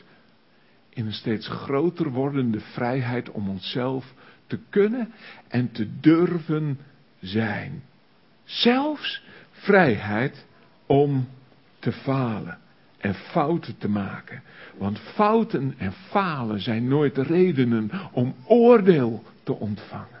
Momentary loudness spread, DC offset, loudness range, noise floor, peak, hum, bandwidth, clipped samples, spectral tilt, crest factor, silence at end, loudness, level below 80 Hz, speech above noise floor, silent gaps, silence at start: 15 LU; under 0.1%; 7 LU; -59 dBFS; -2 dBFS; none; 5.8 kHz; under 0.1%; -11 dB/octave; 22 dB; 0 s; -24 LUFS; -58 dBFS; 36 dB; none; 0.95 s